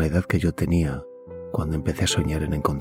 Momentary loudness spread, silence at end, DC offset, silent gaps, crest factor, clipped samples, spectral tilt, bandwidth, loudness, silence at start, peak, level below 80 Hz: 11 LU; 0 s; under 0.1%; none; 18 dB; under 0.1%; -5.5 dB/octave; 16.5 kHz; -24 LUFS; 0 s; -6 dBFS; -38 dBFS